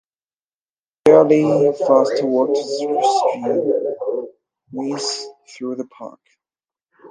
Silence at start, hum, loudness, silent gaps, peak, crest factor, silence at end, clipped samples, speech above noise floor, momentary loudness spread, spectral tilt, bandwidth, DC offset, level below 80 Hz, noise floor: 1.05 s; none; -17 LUFS; none; 0 dBFS; 18 dB; 0.05 s; under 0.1%; over 73 dB; 20 LU; -5 dB/octave; 10.5 kHz; under 0.1%; -68 dBFS; under -90 dBFS